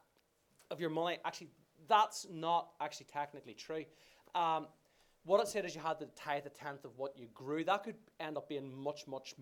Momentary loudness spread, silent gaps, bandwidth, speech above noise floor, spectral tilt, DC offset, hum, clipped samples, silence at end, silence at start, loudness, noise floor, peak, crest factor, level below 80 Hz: 16 LU; none; 18 kHz; 37 dB; -4 dB/octave; under 0.1%; none; under 0.1%; 0 s; 0.7 s; -39 LUFS; -76 dBFS; -18 dBFS; 22 dB; -82 dBFS